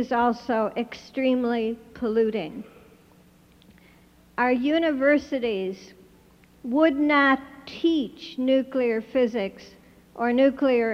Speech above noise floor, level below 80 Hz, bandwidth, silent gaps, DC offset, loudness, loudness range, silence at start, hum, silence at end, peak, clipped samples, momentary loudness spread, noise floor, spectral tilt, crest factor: 32 dB; -60 dBFS; 7 kHz; none; under 0.1%; -24 LUFS; 5 LU; 0 s; none; 0 s; -6 dBFS; under 0.1%; 13 LU; -55 dBFS; -6 dB/octave; 18 dB